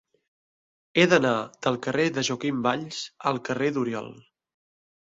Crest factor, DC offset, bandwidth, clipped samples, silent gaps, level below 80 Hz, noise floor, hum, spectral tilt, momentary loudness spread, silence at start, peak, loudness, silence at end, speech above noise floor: 24 dB; under 0.1%; 8 kHz; under 0.1%; none; -66 dBFS; under -90 dBFS; none; -4.5 dB/octave; 11 LU; 0.95 s; -4 dBFS; -25 LUFS; 0.8 s; over 65 dB